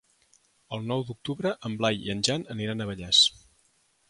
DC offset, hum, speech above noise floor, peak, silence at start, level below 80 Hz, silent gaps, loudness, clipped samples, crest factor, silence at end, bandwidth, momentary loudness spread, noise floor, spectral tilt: under 0.1%; none; 39 dB; -8 dBFS; 0.7 s; -58 dBFS; none; -26 LUFS; under 0.1%; 22 dB; 0.8 s; 11.5 kHz; 14 LU; -67 dBFS; -3.5 dB/octave